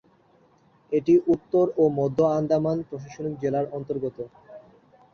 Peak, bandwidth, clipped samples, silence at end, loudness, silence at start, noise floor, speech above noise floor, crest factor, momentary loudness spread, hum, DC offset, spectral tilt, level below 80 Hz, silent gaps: -10 dBFS; 6.6 kHz; under 0.1%; 0.55 s; -24 LUFS; 0.9 s; -60 dBFS; 36 dB; 16 dB; 13 LU; none; under 0.1%; -9 dB/octave; -62 dBFS; none